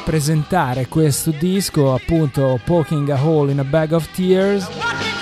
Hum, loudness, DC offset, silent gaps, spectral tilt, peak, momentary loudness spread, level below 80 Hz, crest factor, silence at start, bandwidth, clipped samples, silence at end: none; -17 LUFS; under 0.1%; none; -6 dB/octave; -2 dBFS; 3 LU; -38 dBFS; 14 dB; 0 s; 15 kHz; under 0.1%; 0 s